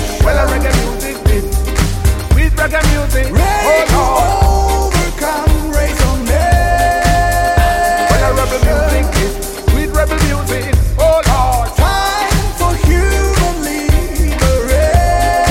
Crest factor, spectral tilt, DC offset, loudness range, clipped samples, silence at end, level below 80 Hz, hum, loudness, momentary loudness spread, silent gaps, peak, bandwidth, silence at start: 12 dB; -5 dB/octave; under 0.1%; 1 LU; under 0.1%; 0 s; -14 dBFS; none; -13 LUFS; 4 LU; none; 0 dBFS; 16.5 kHz; 0 s